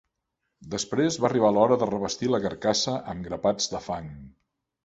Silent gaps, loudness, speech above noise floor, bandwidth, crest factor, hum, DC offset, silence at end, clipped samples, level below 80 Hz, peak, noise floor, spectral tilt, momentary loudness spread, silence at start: none; -25 LUFS; 55 dB; 8.2 kHz; 20 dB; none; under 0.1%; 0.55 s; under 0.1%; -56 dBFS; -6 dBFS; -81 dBFS; -4.5 dB/octave; 13 LU; 0.6 s